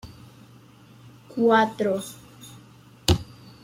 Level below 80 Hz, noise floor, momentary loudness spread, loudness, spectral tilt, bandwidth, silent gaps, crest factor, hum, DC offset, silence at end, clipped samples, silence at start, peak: -44 dBFS; -50 dBFS; 26 LU; -23 LUFS; -5 dB/octave; 16.5 kHz; none; 24 dB; none; under 0.1%; 0.4 s; under 0.1%; 0.05 s; -4 dBFS